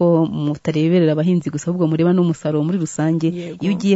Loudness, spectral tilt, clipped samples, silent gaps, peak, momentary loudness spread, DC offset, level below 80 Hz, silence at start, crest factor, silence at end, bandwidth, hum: -18 LUFS; -7.5 dB/octave; under 0.1%; none; -4 dBFS; 6 LU; under 0.1%; -58 dBFS; 0 s; 14 dB; 0 s; 8 kHz; none